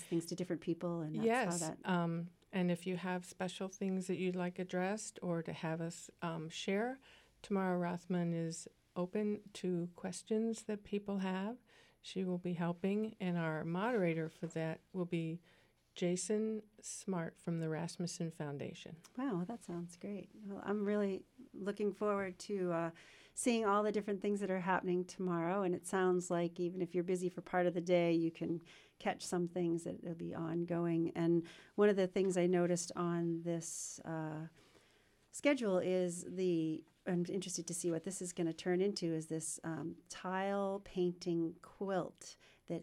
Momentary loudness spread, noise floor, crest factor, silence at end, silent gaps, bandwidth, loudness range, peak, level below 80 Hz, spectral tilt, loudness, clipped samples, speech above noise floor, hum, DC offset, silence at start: 11 LU; -71 dBFS; 20 dB; 0 s; none; 13 kHz; 5 LU; -18 dBFS; -76 dBFS; -5.5 dB/octave; -39 LUFS; under 0.1%; 32 dB; none; under 0.1%; 0 s